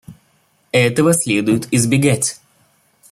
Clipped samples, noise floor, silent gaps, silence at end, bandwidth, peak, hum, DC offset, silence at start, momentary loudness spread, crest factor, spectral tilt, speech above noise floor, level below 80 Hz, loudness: under 0.1%; -59 dBFS; none; 0.8 s; 16 kHz; -2 dBFS; none; under 0.1%; 0.1 s; 5 LU; 16 dB; -4.5 dB/octave; 44 dB; -54 dBFS; -15 LUFS